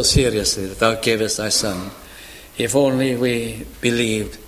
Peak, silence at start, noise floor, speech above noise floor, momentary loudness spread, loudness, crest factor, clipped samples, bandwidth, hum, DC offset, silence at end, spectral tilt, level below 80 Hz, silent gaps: 0 dBFS; 0 s; -40 dBFS; 20 dB; 17 LU; -19 LUFS; 20 dB; under 0.1%; 16 kHz; none; under 0.1%; 0 s; -3.5 dB/octave; -36 dBFS; none